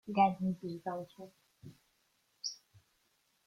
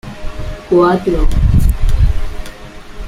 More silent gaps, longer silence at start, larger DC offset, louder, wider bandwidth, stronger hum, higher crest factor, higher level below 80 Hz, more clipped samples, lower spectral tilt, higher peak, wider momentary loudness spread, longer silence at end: neither; about the same, 0.05 s vs 0.05 s; neither; second, -36 LUFS vs -14 LUFS; second, 13 kHz vs 14.5 kHz; neither; first, 22 dB vs 12 dB; second, -76 dBFS vs -16 dBFS; neither; second, -5.5 dB/octave vs -8 dB/octave; second, -16 dBFS vs -2 dBFS; first, 27 LU vs 19 LU; first, 0.9 s vs 0 s